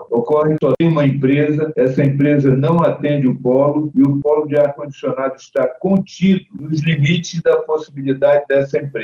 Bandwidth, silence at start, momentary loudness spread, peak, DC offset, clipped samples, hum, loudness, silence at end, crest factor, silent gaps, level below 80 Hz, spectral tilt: 7.2 kHz; 0 s; 7 LU; -4 dBFS; under 0.1%; under 0.1%; none; -16 LUFS; 0 s; 12 dB; none; -54 dBFS; -8 dB/octave